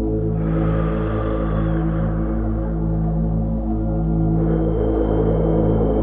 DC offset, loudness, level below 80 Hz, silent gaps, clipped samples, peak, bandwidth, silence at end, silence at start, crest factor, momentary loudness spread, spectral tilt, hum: 0.3%; -20 LUFS; -24 dBFS; none; under 0.1%; -6 dBFS; 3.6 kHz; 0 s; 0 s; 12 dB; 4 LU; -13 dB/octave; 50 Hz at -50 dBFS